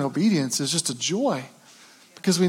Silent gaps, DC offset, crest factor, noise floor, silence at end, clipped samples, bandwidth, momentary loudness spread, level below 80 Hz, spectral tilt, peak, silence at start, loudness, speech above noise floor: none; under 0.1%; 16 dB; -51 dBFS; 0 s; under 0.1%; 17 kHz; 8 LU; -82 dBFS; -4 dB/octave; -8 dBFS; 0 s; -24 LUFS; 27 dB